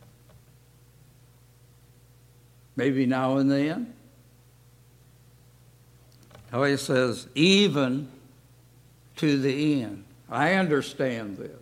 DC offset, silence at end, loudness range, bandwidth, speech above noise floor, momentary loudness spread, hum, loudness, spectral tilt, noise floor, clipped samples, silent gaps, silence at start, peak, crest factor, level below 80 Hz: under 0.1%; 0 s; 7 LU; 15.5 kHz; 32 dB; 18 LU; 60 Hz at -55 dBFS; -25 LUFS; -5.5 dB/octave; -56 dBFS; under 0.1%; none; 2.75 s; -6 dBFS; 20 dB; -64 dBFS